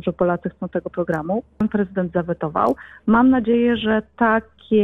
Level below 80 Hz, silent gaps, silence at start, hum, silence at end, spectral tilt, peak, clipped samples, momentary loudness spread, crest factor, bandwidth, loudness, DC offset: -48 dBFS; none; 0.05 s; none; 0 s; -9 dB/octave; -6 dBFS; under 0.1%; 10 LU; 14 dB; 4 kHz; -20 LUFS; under 0.1%